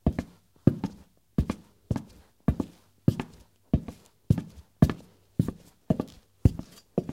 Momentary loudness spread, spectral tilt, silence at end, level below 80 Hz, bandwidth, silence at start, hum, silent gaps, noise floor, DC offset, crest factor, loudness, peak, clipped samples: 15 LU; -9 dB/octave; 0 s; -40 dBFS; 16 kHz; 0.05 s; none; none; -53 dBFS; under 0.1%; 26 dB; -30 LUFS; -4 dBFS; under 0.1%